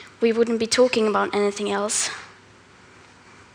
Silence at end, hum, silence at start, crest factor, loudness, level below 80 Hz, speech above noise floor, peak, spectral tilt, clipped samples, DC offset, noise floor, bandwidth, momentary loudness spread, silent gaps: 1.25 s; none; 0 s; 18 dB; -21 LUFS; -64 dBFS; 29 dB; -6 dBFS; -3 dB/octave; under 0.1%; under 0.1%; -50 dBFS; 12 kHz; 6 LU; none